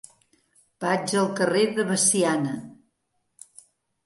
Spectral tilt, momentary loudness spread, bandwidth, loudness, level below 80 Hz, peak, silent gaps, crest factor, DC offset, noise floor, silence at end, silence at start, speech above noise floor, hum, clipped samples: -3.5 dB/octave; 11 LU; 12 kHz; -23 LUFS; -72 dBFS; -8 dBFS; none; 18 dB; under 0.1%; -75 dBFS; 1.3 s; 0.8 s; 52 dB; none; under 0.1%